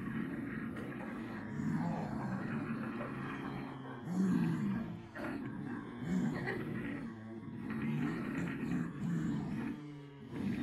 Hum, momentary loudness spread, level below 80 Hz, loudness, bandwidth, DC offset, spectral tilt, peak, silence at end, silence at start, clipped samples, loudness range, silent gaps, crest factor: none; 9 LU; -64 dBFS; -40 LUFS; 13 kHz; under 0.1%; -8 dB/octave; -22 dBFS; 0 s; 0 s; under 0.1%; 2 LU; none; 18 dB